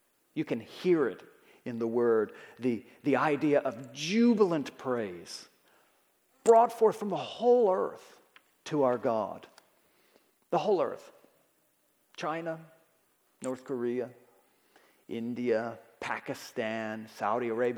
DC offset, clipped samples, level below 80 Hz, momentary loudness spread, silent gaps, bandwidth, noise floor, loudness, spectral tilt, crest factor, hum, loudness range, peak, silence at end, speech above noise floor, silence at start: under 0.1%; under 0.1%; -84 dBFS; 16 LU; none; 16 kHz; -71 dBFS; -30 LUFS; -5.5 dB/octave; 22 dB; none; 11 LU; -10 dBFS; 0 s; 42 dB; 0.35 s